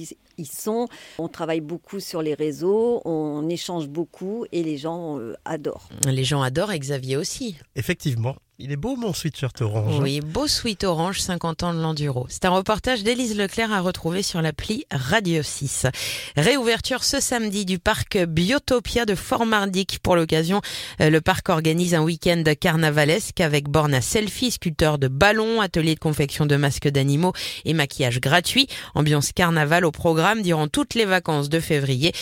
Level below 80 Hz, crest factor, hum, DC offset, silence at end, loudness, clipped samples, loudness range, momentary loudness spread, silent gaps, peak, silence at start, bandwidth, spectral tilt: -44 dBFS; 20 dB; none; under 0.1%; 0 s; -22 LUFS; under 0.1%; 6 LU; 10 LU; none; -2 dBFS; 0 s; 17 kHz; -4.5 dB/octave